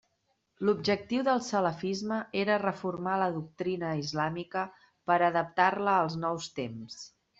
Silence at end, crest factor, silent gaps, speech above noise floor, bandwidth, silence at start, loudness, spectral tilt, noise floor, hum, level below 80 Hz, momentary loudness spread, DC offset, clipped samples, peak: 0.35 s; 20 dB; none; 47 dB; 8 kHz; 0.6 s; -30 LUFS; -5.5 dB/octave; -76 dBFS; none; -70 dBFS; 11 LU; under 0.1%; under 0.1%; -10 dBFS